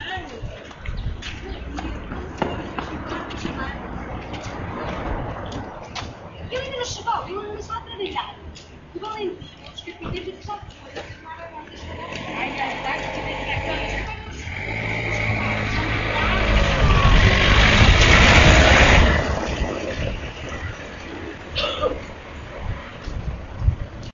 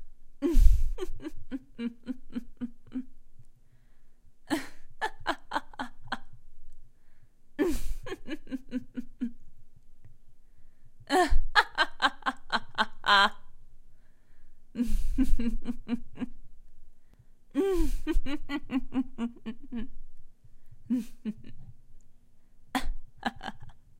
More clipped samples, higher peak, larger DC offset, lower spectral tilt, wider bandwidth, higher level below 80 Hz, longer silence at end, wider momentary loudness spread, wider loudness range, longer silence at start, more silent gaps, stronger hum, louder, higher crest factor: neither; first, 0 dBFS vs -4 dBFS; neither; about the same, -4.5 dB/octave vs -4.5 dB/octave; second, 7.6 kHz vs 11.5 kHz; first, -26 dBFS vs -34 dBFS; second, 0 s vs 0.2 s; first, 22 LU vs 16 LU; first, 17 LU vs 12 LU; about the same, 0 s vs 0 s; neither; neither; first, -21 LUFS vs -32 LUFS; about the same, 22 dB vs 24 dB